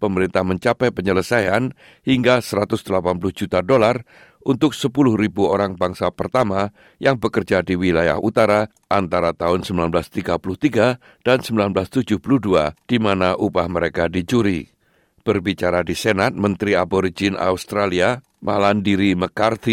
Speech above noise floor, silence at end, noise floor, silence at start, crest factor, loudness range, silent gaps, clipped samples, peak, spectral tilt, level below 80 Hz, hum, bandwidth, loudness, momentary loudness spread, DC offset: 41 dB; 0 s; -60 dBFS; 0 s; 16 dB; 1 LU; none; under 0.1%; -4 dBFS; -6 dB/octave; -50 dBFS; none; 16.5 kHz; -19 LUFS; 5 LU; under 0.1%